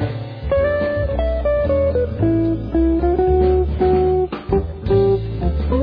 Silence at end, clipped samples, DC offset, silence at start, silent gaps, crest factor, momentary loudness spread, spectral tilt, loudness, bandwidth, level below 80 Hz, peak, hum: 0 s; under 0.1%; under 0.1%; 0 s; none; 12 dB; 6 LU; -11.5 dB/octave; -18 LUFS; 5.2 kHz; -24 dBFS; -4 dBFS; none